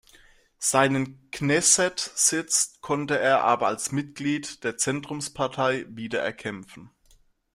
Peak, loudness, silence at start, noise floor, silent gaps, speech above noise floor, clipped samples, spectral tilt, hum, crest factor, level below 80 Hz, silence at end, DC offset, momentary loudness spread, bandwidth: -4 dBFS; -24 LUFS; 0.6 s; -60 dBFS; none; 35 dB; under 0.1%; -2.5 dB/octave; none; 22 dB; -62 dBFS; 0.65 s; under 0.1%; 11 LU; 16 kHz